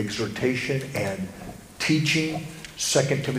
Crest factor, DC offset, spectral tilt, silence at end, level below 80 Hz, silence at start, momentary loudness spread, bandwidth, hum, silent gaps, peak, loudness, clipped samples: 18 dB; under 0.1%; -4 dB/octave; 0 s; -54 dBFS; 0 s; 14 LU; 15.5 kHz; none; none; -8 dBFS; -25 LUFS; under 0.1%